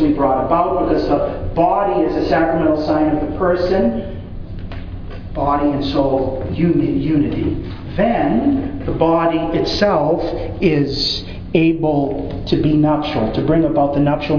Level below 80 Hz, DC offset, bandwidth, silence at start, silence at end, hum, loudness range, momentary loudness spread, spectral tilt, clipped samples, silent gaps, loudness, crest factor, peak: -32 dBFS; under 0.1%; 5.4 kHz; 0 s; 0 s; none; 3 LU; 9 LU; -7.5 dB/octave; under 0.1%; none; -17 LUFS; 16 dB; 0 dBFS